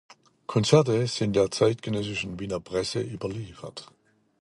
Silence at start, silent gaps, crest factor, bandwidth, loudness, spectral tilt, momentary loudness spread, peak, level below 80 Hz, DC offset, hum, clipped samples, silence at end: 0.5 s; none; 24 dB; 11.5 kHz; -26 LUFS; -5.5 dB/octave; 19 LU; -4 dBFS; -56 dBFS; under 0.1%; none; under 0.1%; 0.55 s